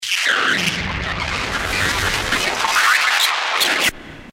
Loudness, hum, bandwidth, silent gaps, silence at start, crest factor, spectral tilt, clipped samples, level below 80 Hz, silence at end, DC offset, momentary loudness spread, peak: -17 LUFS; none; 16.5 kHz; none; 0 s; 16 dB; -1.5 dB/octave; under 0.1%; -36 dBFS; 0 s; under 0.1%; 8 LU; -4 dBFS